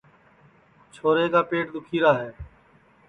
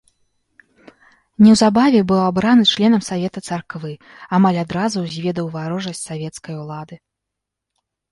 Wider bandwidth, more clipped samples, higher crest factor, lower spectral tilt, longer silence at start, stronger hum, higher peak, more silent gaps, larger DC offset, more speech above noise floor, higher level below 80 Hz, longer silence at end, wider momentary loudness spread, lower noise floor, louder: second, 9.8 kHz vs 11.5 kHz; neither; about the same, 20 dB vs 16 dB; first, -7 dB/octave vs -5.5 dB/octave; second, 1.05 s vs 1.4 s; neither; second, -6 dBFS vs -2 dBFS; neither; neither; second, 35 dB vs 65 dB; about the same, -54 dBFS vs -54 dBFS; second, 0.65 s vs 1.15 s; second, 12 LU vs 18 LU; second, -57 dBFS vs -81 dBFS; second, -23 LUFS vs -16 LUFS